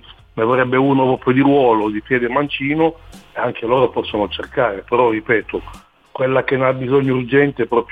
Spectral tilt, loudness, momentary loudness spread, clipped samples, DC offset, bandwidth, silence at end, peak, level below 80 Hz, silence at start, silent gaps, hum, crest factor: -8 dB/octave; -17 LUFS; 8 LU; under 0.1%; under 0.1%; 4.9 kHz; 0.05 s; -2 dBFS; -46 dBFS; 0.1 s; none; none; 16 dB